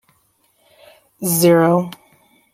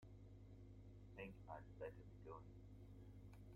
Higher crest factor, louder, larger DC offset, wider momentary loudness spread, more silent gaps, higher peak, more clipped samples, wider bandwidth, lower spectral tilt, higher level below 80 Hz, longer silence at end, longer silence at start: about the same, 18 dB vs 18 dB; first, -15 LUFS vs -60 LUFS; neither; first, 14 LU vs 7 LU; neither; first, -2 dBFS vs -40 dBFS; neither; first, 16.5 kHz vs 14 kHz; second, -5.5 dB/octave vs -8 dB/octave; about the same, -62 dBFS vs -66 dBFS; first, 0.65 s vs 0 s; first, 1.2 s vs 0 s